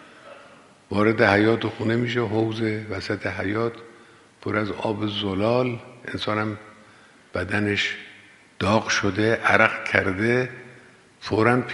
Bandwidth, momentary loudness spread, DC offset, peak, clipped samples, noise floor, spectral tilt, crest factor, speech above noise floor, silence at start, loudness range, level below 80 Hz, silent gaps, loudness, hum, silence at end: 11.5 kHz; 14 LU; under 0.1%; 0 dBFS; under 0.1%; -51 dBFS; -5.5 dB/octave; 24 dB; 29 dB; 0 s; 5 LU; -58 dBFS; none; -23 LUFS; none; 0 s